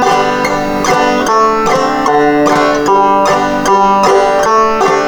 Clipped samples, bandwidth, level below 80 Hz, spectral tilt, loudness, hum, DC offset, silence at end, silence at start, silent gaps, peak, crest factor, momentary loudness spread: under 0.1%; over 20 kHz; -36 dBFS; -4 dB/octave; -10 LUFS; none; under 0.1%; 0 s; 0 s; none; 0 dBFS; 10 dB; 3 LU